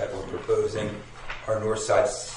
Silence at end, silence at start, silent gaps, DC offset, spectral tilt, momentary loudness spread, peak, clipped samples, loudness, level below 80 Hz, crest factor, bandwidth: 0 s; 0 s; none; under 0.1%; -4 dB/octave; 13 LU; -10 dBFS; under 0.1%; -27 LUFS; -48 dBFS; 18 dB; 11 kHz